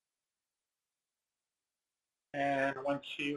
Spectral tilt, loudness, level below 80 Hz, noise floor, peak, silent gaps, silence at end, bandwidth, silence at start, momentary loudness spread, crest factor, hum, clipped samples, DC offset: -5.5 dB/octave; -35 LUFS; -78 dBFS; under -90 dBFS; -20 dBFS; none; 0 s; 11.5 kHz; 2.35 s; 5 LU; 20 dB; none; under 0.1%; under 0.1%